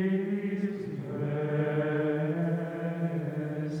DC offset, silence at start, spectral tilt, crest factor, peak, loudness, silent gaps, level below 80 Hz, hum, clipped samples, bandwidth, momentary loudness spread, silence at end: under 0.1%; 0 s; -9.5 dB/octave; 14 dB; -18 dBFS; -31 LUFS; none; -72 dBFS; none; under 0.1%; 6.6 kHz; 5 LU; 0 s